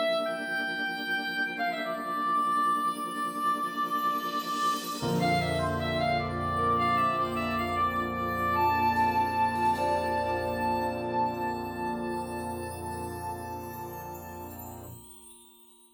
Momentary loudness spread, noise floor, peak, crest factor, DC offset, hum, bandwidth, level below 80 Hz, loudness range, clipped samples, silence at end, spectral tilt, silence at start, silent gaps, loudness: 13 LU; -56 dBFS; -16 dBFS; 14 dB; under 0.1%; none; over 20 kHz; -54 dBFS; 9 LU; under 0.1%; 0.5 s; -5 dB/octave; 0 s; none; -29 LUFS